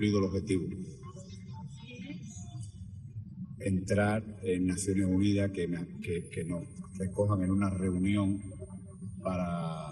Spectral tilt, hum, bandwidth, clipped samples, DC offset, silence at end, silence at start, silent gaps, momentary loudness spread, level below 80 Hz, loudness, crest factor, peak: -6.5 dB/octave; none; 12 kHz; under 0.1%; under 0.1%; 0 s; 0 s; none; 16 LU; -56 dBFS; -32 LUFS; 16 dB; -16 dBFS